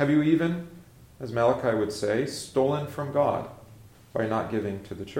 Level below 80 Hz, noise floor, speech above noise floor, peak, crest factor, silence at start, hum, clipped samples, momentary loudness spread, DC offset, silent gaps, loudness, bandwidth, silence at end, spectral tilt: -58 dBFS; -51 dBFS; 25 dB; -10 dBFS; 18 dB; 0 s; none; under 0.1%; 12 LU; under 0.1%; none; -27 LUFS; 16.5 kHz; 0 s; -6.5 dB/octave